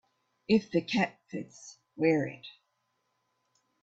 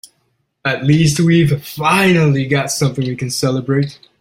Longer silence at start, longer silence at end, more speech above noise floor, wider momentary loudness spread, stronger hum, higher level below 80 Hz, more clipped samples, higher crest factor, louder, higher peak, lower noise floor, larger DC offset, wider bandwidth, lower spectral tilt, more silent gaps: second, 0.5 s vs 0.65 s; first, 1.35 s vs 0.25 s; about the same, 48 dB vs 51 dB; first, 22 LU vs 8 LU; neither; second, -70 dBFS vs -48 dBFS; neither; first, 20 dB vs 14 dB; second, -30 LUFS vs -15 LUFS; second, -12 dBFS vs -2 dBFS; first, -78 dBFS vs -65 dBFS; neither; second, 8 kHz vs 16.5 kHz; about the same, -6 dB/octave vs -5.5 dB/octave; neither